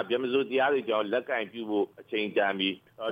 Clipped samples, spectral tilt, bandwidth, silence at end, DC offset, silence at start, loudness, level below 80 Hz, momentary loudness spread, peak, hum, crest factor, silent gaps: under 0.1%; -6.5 dB/octave; 5 kHz; 0 s; under 0.1%; 0 s; -29 LUFS; -80 dBFS; 6 LU; -14 dBFS; none; 16 dB; none